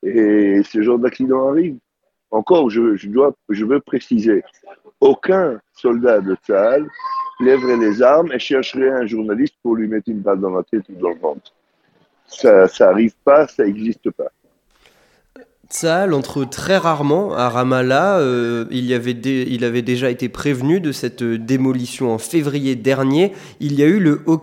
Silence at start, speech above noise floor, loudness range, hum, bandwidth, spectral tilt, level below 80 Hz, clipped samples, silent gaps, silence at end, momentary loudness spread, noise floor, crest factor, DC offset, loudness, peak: 0.05 s; 43 dB; 4 LU; none; 16 kHz; -6 dB/octave; -58 dBFS; under 0.1%; none; 0 s; 10 LU; -59 dBFS; 16 dB; under 0.1%; -17 LUFS; 0 dBFS